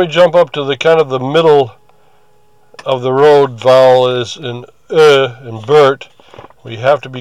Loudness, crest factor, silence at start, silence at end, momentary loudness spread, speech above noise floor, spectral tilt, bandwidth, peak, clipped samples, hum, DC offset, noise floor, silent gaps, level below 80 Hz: -10 LUFS; 12 dB; 0 s; 0 s; 16 LU; 42 dB; -5.5 dB/octave; 11.5 kHz; 0 dBFS; under 0.1%; none; 0.5%; -52 dBFS; none; -62 dBFS